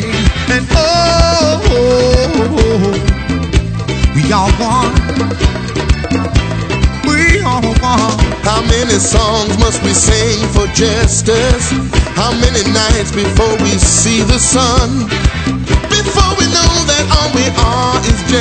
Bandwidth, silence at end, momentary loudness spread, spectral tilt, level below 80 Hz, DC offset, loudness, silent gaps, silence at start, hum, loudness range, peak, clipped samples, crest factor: 9.2 kHz; 0 s; 5 LU; -4 dB/octave; -18 dBFS; under 0.1%; -11 LUFS; none; 0 s; none; 2 LU; 0 dBFS; under 0.1%; 10 dB